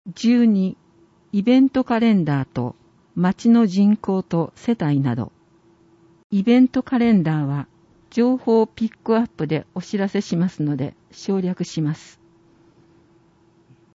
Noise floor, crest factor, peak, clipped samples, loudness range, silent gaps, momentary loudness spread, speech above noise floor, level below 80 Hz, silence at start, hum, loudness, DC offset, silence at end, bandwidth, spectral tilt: -56 dBFS; 16 dB; -4 dBFS; under 0.1%; 6 LU; 6.24-6.30 s; 12 LU; 38 dB; -58 dBFS; 0.05 s; none; -20 LUFS; under 0.1%; 2 s; 7.8 kHz; -7.5 dB/octave